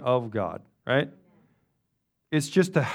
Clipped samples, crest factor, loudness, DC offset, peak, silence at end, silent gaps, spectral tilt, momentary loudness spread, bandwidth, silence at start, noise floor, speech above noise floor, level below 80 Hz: under 0.1%; 20 dB; -27 LUFS; under 0.1%; -8 dBFS; 0 s; none; -6 dB/octave; 11 LU; 15.5 kHz; 0 s; -77 dBFS; 52 dB; -68 dBFS